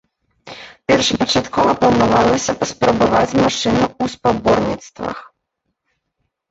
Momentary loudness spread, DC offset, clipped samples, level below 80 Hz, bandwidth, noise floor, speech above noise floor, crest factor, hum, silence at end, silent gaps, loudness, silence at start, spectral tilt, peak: 14 LU; under 0.1%; under 0.1%; -42 dBFS; 8.2 kHz; -74 dBFS; 58 dB; 16 dB; none; 1.3 s; none; -16 LUFS; 0.45 s; -4.5 dB/octave; -2 dBFS